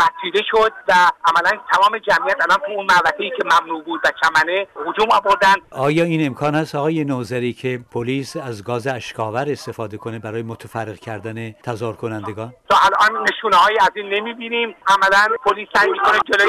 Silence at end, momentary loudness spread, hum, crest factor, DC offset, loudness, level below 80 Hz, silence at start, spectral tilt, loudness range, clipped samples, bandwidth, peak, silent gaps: 0 s; 14 LU; none; 10 dB; under 0.1%; -17 LUFS; -54 dBFS; 0 s; -4.5 dB/octave; 10 LU; under 0.1%; 16 kHz; -8 dBFS; none